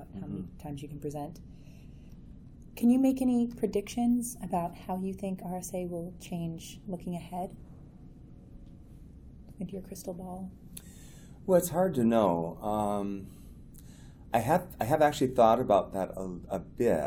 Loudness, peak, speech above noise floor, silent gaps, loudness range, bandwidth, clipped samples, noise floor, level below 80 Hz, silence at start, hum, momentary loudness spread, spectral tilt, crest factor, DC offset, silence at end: -31 LUFS; -10 dBFS; 20 dB; none; 15 LU; 19.5 kHz; under 0.1%; -50 dBFS; -52 dBFS; 0 s; none; 26 LU; -6.5 dB/octave; 22 dB; under 0.1%; 0 s